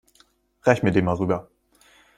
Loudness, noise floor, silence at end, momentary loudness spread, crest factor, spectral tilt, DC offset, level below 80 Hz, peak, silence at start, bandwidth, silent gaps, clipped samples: -22 LUFS; -61 dBFS; 0.75 s; 7 LU; 20 dB; -7.5 dB/octave; under 0.1%; -54 dBFS; -4 dBFS; 0.65 s; 13.5 kHz; none; under 0.1%